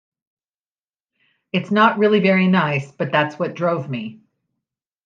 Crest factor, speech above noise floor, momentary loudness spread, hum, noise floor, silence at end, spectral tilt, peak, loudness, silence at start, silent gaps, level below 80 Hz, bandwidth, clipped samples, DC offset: 20 dB; over 72 dB; 11 LU; none; under -90 dBFS; 0.9 s; -7.5 dB/octave; -2 dBFS; -18 LUFS; 1.55 s; none; -70 dBFS; 7.2 kHz; under 0.1%; under 0.1%